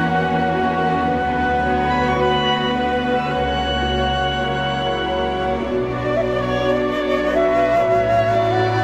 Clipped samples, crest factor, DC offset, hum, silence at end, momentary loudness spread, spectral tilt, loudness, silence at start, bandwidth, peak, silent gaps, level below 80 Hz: under 0.1%; 12 dB; 0.2%; none; 0 s; 4 LU; -6 dB/octave; -19 LUFS; 0 s; 12.5 kHz; -6 dBFS; none; -34 dBFS